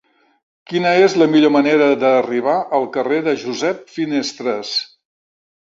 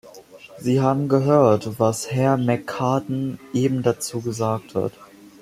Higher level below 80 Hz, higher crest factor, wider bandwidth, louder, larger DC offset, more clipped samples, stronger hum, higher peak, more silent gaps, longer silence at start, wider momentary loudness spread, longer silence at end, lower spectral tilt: about the same, -64 dBFS vs -60 dBFS; about the same, 16 dB vs 18 dB; second, 7.8 kHz vs 15 kHz; first, -16 LUFS vs -21 LUFS; neither; neither; neither; about the same, -2 dBFS vs -2 dBFS; neither; first, 0.7 s vs 0.05 s; about the same, 9 LU vs 10 LU; first, 0.9 s vs 0.15 s; second, -5 dB/octave vs -6.5 dB/octave